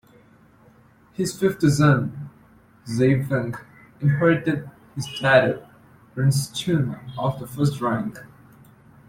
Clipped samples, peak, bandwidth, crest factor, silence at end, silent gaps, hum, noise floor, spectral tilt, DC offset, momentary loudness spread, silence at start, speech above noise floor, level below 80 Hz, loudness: under 0.1%; -4 dBFS; 16 kHz; 20 dB; 0.85 s; none; none; -54 dBFS; -6 dB/octave; under 0.1%; 19 LU; 1.2 s; 33 dB; -54 dBFS; -22 LUFS